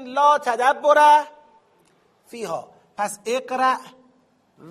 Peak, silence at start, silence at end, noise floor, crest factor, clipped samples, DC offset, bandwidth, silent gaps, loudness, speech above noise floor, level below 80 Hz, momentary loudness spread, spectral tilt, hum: -2 dBFS; 0 s; 0 s; -61 dBFS; 18 dB; under 0.1%; under 0.1%; 15 kHz; none; -19 LUFS; 42 dB; -78 dBFS; 18 LU; -2.5 dB/octave; none